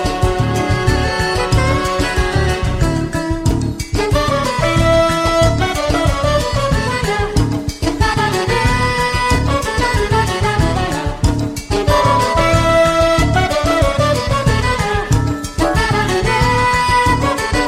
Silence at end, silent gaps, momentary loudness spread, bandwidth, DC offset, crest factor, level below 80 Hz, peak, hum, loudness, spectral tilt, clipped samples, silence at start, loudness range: 0 s; none; 5 LU; 15.5 kHz; under 0.1%; 14 dB; -22 dBFS; -2 dBFS; none; -15 LUFS; -5 dB/octave; under 0.1%; 0 s; 2 LU